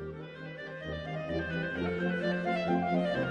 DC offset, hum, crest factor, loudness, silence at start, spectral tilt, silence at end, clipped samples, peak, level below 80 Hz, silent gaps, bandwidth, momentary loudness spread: under 0.1%; none; 16 dB; -33 LUFS; 0 s; -7.5 dB/octave; 0 s; under 0.1%; -16 dBFS; -54 dBFS; none; 8.8 kHz; 13 LU